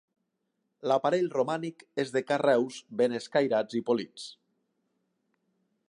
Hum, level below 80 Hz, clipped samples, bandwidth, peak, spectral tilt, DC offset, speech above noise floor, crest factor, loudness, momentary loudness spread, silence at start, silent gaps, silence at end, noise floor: none; -82 dBFS; under 0.1%; 11 kHz; -12 dBFS; -5.5 dB/octave; under 0.1%; 52 dB; 18 dB; -29 LUFS; 11 LU; 0.85 s; none; 1.55 s; -80 dBFS